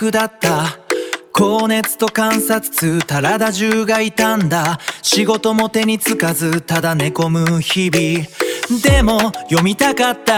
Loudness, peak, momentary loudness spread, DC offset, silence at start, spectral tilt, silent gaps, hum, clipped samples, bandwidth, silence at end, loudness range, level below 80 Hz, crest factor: -15 LUFS; 0 dBFS; 5 LU; under 0.1%; 0 s; -4 dB/octave; none; none; under 0.1%; 19.5 kHz; 0 s; 1 LU; -32 dBFS; 16 dB